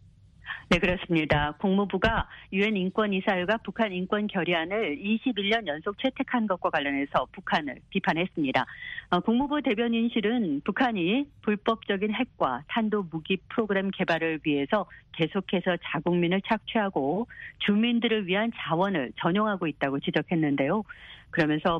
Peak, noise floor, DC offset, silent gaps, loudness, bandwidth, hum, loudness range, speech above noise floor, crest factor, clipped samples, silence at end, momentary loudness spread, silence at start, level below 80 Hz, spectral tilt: -8 dBFS; -49 dBFS; under 0.1%; none; -27 LUFS; 8.2 kHz; none; 2 LU; 22 dB; 20 dB; under 0.1%; 0 s; 5 LU; 0.45 s; -50 dBFS; -7 dB/octave